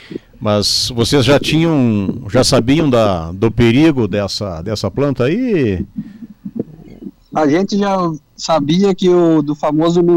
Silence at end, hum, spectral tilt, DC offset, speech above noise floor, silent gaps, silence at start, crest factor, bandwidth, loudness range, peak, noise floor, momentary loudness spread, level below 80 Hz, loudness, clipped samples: 0 s; none; -5.5 dB/octave; under 0.1%; 21 dB; none; 0.1 s; 12 dB; 16 kHz; 5 LU; -2 dBFS; -34 dBFS; 15 LU; -38 dBFS; -14 LUFS; under 0.1%